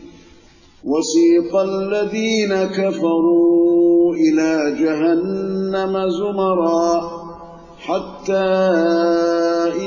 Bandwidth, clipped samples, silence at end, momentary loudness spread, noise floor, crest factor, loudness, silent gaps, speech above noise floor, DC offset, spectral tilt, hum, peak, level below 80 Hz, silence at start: 7.4 kHz; under 0.1%; 0 s; 10 LU; -47 dBFS; 12 dB; -17 LUFS; none; 31 dB; under 0.1%; -5.5 dB/octave; none; -4 dBFS; -54 dBFS; 0 s